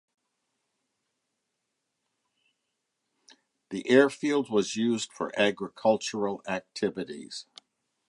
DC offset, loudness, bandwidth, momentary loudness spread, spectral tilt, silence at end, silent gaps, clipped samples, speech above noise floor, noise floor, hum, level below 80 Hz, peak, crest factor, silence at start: under 0.1%; -27 LUFS; 11.5 kHz; 16 LU; -4.5 dB/octave; 0.65 s; none; under 0.1%; 55 dB; -82 dBFS; none; -74 dBFS; -6 dBFS; 24 dB; 3.7 s